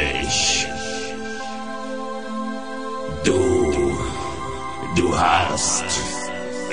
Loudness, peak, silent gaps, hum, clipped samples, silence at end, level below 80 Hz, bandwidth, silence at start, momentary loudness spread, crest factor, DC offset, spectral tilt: -22 LUFS; -4 dBFS; none; none; under 0.1%; 0 s; -38 dBFS; 10 kHz; 0 s; 12 LU; 18 dB; 2%; -3 dB/octave